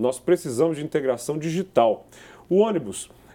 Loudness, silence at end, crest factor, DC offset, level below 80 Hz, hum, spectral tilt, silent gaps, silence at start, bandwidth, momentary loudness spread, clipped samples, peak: -23 LUFS; 0.3 s; 20 dB; under 0.1%; -62 dBFS; none; -6 dB/octave; none; 0 s; 17 kHz; 9 LU; under 0.1%; -4 dBFS